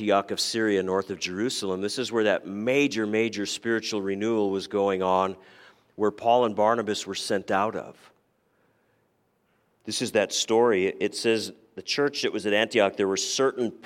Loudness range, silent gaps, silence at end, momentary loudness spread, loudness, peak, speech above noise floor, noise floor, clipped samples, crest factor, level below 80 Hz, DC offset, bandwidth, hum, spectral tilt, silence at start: 5 LU; none; 0.1 s; 7 LU; -25 LUFS; -8 dBFS; 44 dB; -69 dBFS; under 0.1%; 20 dB; -74 dBFS; under 0.1%; 16 kHz; none; -3.5 dB/octave; 0 s